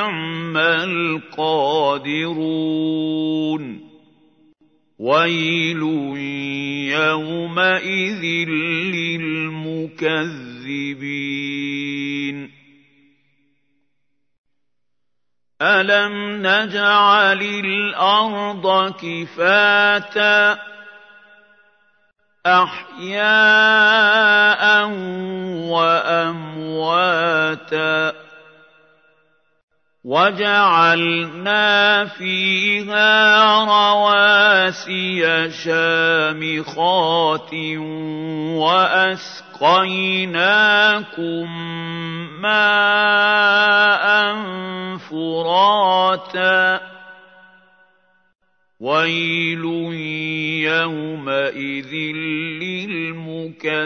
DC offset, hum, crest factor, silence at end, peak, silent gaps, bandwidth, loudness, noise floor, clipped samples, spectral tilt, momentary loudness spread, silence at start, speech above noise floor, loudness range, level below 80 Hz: under 0.1%; none; 18 dB; 0 s; -2 dBFS; 14.38-14.44 s, 29.63-29.68 s; 6.6 kHz; -17 LUFS; -82 dBFS; under 0.1%; -4.5 dB/octave; 14 LU; 0 s; 64 dB; 9 LU; -76 dBFS